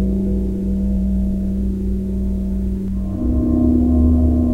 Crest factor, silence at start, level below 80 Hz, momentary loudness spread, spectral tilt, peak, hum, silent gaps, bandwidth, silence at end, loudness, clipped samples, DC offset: 14 dB; 0 s; -22 dBFS; 7 LU; -11 dB/octave; -4 dBFS; none; none; 2.7 kHz; 0 s; -19 LUFS; under 0.1%; under 0.1%